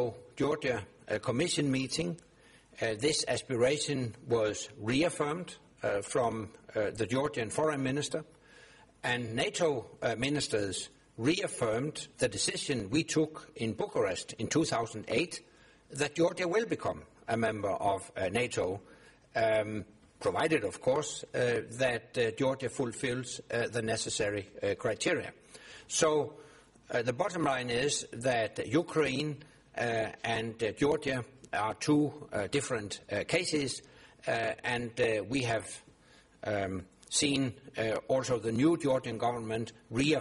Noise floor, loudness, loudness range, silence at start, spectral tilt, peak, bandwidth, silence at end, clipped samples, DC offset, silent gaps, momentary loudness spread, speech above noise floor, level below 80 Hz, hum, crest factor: -61 dBFS; -32 LUFS; 2 LU; 0 s; -4 dB/octave; -12 dBFS; 11.5 kHz; 0 s; under 0.1%; under 0.1%; none; 8 LU; 29 dB; -62 dBFS; none; 20 dB